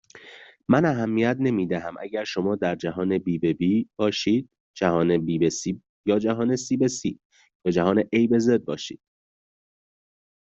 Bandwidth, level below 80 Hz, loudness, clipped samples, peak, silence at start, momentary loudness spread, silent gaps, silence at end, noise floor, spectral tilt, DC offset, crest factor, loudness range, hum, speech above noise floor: 8 kHz; -62 dBFS; -24 LUFS; under 0.1%; -6 dBFS; 0.15 s; 11 LU; 4.60-4.74 s, 5.89-6.04 s, 7.25-7.30 s, 7.55-7.60 s; 1.45 s; -47 dBFS; -6 dB/octave; under 0.1%; 20 dB; 2 LU; none; 24 dB